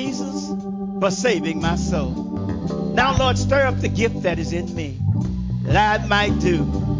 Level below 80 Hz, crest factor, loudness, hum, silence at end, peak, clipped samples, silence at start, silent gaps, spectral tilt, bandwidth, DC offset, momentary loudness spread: -32 dBFS; 16 dB; -21 LUFS; none; 0 s; -4 dBFS; under 0.1%; 0 s; none; -5.5 dB/octave; 7.6 kHz; under 0.1%; 9 LU